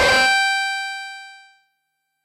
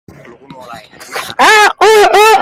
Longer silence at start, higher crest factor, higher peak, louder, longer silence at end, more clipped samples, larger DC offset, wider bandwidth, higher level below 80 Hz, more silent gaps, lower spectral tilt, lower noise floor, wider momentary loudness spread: second, 0 s vs 0.6 s; first, 18 dB vs 10 dB; second, -4 dBFS vs 0 dBFS; second, -18 LUFS vs -6 LUFS; first, 0.9 s vs 0 s; neither; neither; about the same, 16 kHz vs 16.5 kHz; about the same, -50 dBFS vs -48 dBFS; neither; about the same, -1 dB/octave vs -1 dB/octave; first, -74 dBFS vs -35 dBFS; first, 19 LU vs 16 LU